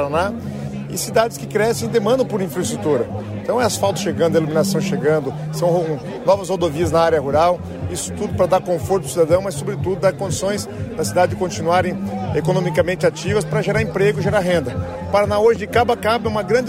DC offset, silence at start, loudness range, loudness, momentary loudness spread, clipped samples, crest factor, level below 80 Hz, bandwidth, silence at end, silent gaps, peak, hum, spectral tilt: under 0.1%; 0 s; 2 LU; -19 LUFS; 8 LU; under 0.1%; 14 dB; -44 dBFS; 16 kHz; 0 s; none; -4 dBFS; none; -5.5 dB/octave